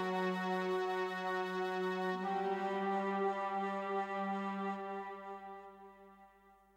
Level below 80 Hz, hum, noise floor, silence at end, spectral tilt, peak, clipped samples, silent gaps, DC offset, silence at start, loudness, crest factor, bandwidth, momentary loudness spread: -80 dBFS; none; -65 dBFS; 0.25 s; -6.5 dB/octave; -26 dBFS; under 0.1%; none; under 0.1%; 0 s; -38 LUFS; 12 dB; 15 kHz; 12 LU